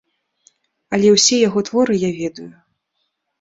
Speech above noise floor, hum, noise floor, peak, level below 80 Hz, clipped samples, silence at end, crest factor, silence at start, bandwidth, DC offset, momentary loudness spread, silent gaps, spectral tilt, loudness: 56 dB; none; -72 dBFS; -2 dBFS; -58 dBFS; under 0.1%; 0.9 s; 18 dB; 0.9 s; 8 kHz; under 0.1%; 15 LU; none; -3.5 dB/octave; -16 LUFS